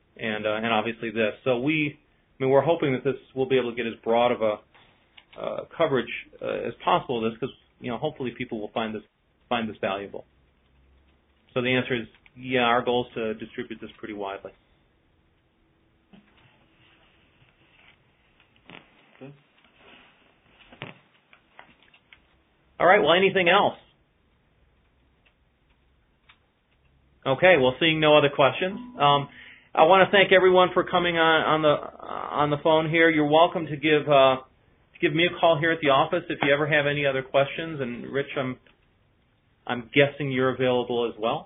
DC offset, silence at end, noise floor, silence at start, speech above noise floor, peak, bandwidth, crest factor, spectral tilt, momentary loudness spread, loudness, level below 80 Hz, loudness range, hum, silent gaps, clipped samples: under 0.1%; 0 s; -66 dBFS; 0.2 s; 43 dB; -2 dBFS; 3.9 kHz; 22 dB; -1.5 dB/octave; 17 LU; -23 LUFS; -62 dBFS; 12 LU; none; none; under 0.1%